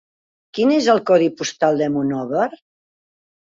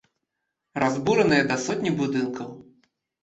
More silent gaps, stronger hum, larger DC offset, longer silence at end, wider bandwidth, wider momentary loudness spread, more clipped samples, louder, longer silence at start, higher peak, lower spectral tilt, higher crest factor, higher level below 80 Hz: neither; neither; neither; first, 0.95 s vs 0.6 s; about the same, 7.8 kHz vs 8.2 kHz; second, 7 LU vs 16 LU; neither; first, -18 LUFS vs -23 LUFS; second, 0.55 s vs 0.75 s; first, -2 dBFS vs -6 dBFS; about the same, -5 dB/octave vs -5 dB/octave; about the same, 16 dB vs 20 dB; about the same, -64 dBFS vs -62 dBFS